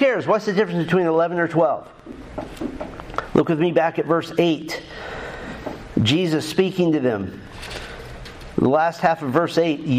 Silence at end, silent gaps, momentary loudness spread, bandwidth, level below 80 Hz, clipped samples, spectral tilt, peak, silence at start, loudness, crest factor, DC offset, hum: 0 s; none; 15 LU; 15 kHz; -46 dBFS; under 0.1%; -6.5 dB/octave; -2 dBFS; 0 s; -21 LUFS; 20 dB; under 0.1%; none